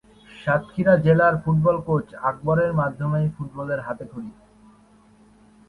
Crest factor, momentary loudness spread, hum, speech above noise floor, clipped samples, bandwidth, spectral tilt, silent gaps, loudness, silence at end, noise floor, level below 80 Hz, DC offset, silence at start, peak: 18 dB; 15 LU; none; 32 dB; under 0.1%; 4.5 kHz; -9.5 dB/octave; none; -22 LUFS; 1.35 s; -54 dBFS; -52 dBFS; under 0.1%; 0.35 s; -4 dBFS